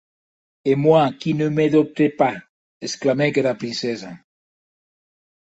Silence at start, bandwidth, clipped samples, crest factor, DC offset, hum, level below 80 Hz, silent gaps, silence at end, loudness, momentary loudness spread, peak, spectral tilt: 0.65 s; 8.2 kHz; under 0.1%; 18 dB; under 0.1%; none; -64 dBFS; 2.49-2.80 s; 1.4 s; -20 LUFS; 15 LU; -2 dBFS; -6 dB/octave